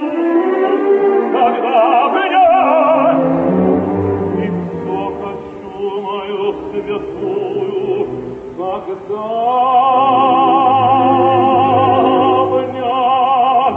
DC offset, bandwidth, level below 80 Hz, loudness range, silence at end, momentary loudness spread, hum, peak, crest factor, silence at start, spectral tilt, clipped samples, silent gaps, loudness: under 0.1%; 4.3 kHz; -52 dBFS; 9 LU; 0 s; 11 LU; none; -2 dBFS; 12 dB; 0 s; -8.5 dB/octave; under 0.1%; none; -14 LUFS